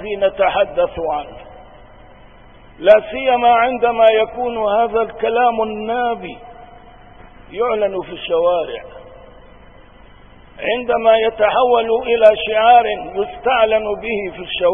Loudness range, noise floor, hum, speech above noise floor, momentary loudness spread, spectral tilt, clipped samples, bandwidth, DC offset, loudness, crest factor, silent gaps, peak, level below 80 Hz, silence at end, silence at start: 8 LU; -43 dBFS; none; 28 dB; 12 LU; -6.5 dB/octave; under 0.1%; 3.7 kHz; 0.3%; -16 LUFS; 16 dB; none; 0 dBFS; -44 dBFS; 0 s; 0 s